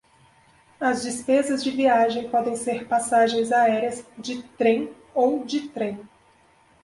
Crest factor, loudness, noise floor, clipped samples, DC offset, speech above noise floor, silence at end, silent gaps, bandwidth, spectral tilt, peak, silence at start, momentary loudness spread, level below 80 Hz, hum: 16 dB; -23 LUFS; -58 dBFS; under 0.1%; under 0.1%; 36 dB; 0.75 s; none; 11.5 kHz; -3.5 dB/octave; -8 dBFS; 0.8 s; 10 LU; -66 dBFS; none